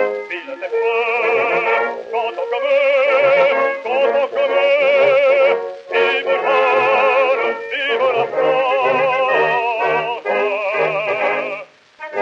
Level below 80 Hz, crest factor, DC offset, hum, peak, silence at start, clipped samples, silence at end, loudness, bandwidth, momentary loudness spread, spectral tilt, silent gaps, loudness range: -78 dBFS; 12 dB; under 0.1%; none; -4 dBFS; 0 s; under 0.1%; 0 s; -16 LUFS; 7 kHz; 8 LU; -4.5 dB/octave; none; 3 LU